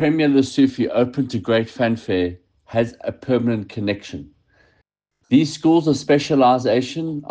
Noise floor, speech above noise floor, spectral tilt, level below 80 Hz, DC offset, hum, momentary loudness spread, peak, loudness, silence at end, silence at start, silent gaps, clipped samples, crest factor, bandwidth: -67 dBFS; 49 dB; -6.5 dB/octave; -56 dBFS; under 0.1%; none; 10 LU; -4 dBFS; -19 LUFS; 0.05 s; 0 s; none; under 0.1%; 16 dB; 9.2 kHz